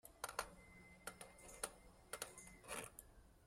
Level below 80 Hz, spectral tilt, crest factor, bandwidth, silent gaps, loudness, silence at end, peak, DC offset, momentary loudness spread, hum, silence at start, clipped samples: -70 dBFS; -1.5 dB/octave; 30 dB; 16 kHz; none; -52 LUFS; 0 s; -24 dBFS; under 0.1%; 14 LU; none; 0.05 s; under 0.1%